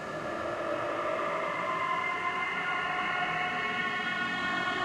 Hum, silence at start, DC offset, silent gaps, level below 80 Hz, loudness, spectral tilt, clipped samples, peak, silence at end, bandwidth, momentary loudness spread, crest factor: none; 0 s; under 0.1%; none; -64 dBFS; -31 LUFS; -4 dB/octave; under 0.1%; -18 dBFS; 0 s; 13.5 kHz; 3 LU; 14 dB